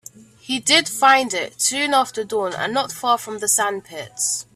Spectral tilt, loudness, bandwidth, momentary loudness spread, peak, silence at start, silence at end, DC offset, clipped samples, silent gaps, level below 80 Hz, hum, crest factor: -0.5 dB/octave; -19 LUFS; 16 kHz; 9 LU; -2 dBFS; 0.45 s; 0.15 s; under 0.1%; under 0.1%; none; -66 dBFS; none; 20 dB